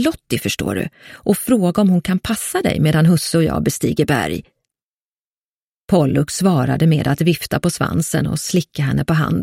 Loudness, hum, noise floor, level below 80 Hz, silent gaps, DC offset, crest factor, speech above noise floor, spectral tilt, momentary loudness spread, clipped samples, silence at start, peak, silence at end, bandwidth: -17 LUFS; none; under -90 dBFS; -42 dBFS; 4.83-5.88 s; under 0.1%; 16 dB; over 73 dB; -5.5 dB/octave; 6 LU; under 0.1%; 0 s; -2 dBFS; 0 s; 16.5 kHz